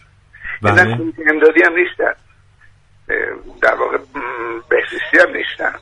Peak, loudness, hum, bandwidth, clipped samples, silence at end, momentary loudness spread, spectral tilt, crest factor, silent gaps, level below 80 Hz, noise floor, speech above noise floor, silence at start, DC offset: 0 dBFS; -15 LUFS; none; 10.5 kHz; under 0.1%; 0.05 s; 13 LU; -6 dB/octave; 16 dB; none; -46 dBFS; -48 dBFS; 33 dB; 0.4 s; under 0.1%